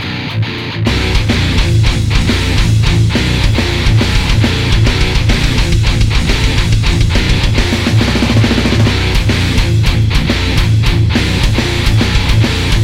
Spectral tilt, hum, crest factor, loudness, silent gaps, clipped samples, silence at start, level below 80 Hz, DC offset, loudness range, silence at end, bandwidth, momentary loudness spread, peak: -5 dB/octave; none; 10 dB; -12 LUFS; none; under 0.1%; 0 s; -16 dBFS; under 0.1%; 0 LU; 0 s; 15 kHz; 2 LU; 0 dBFS